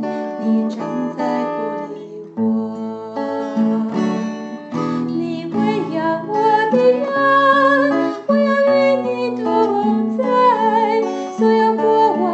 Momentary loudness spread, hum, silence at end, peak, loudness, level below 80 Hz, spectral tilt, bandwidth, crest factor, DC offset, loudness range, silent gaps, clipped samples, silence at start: 10 LU; none; 0 s; -2 dBFS; -17 LUFS; -70 dBFS; -6.5 dB/octave; 8.2 kHz; 14 dB; under 0.1%; 7 LU; none; under 0.1%; 0 s